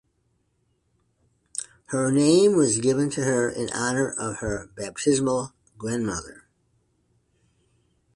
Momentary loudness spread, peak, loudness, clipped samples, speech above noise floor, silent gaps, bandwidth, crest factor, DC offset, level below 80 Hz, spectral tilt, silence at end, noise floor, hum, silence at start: 16 LU; -8 dBFS; -24 LUFS; under 0.1%; 47 dB; none; 11.5 kHz; 18 dB; under 0.1%; -54 dBFS; -4.5 dB/octave; 1.8 s; -70 dBFS; none; 1.55 s